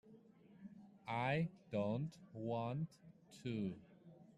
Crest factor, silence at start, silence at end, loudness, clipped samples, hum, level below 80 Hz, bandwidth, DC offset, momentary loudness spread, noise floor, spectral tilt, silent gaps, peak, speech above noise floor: 18 dB; 0.05 s; 0.05 s; -43 LUFS; under 0.1%; none; -78 dBFS; 11.5 kHz; under 0.1%; 20 LU; -65 dBFS; -7.5 dB/octave; none; -26 dBFS; 22 dB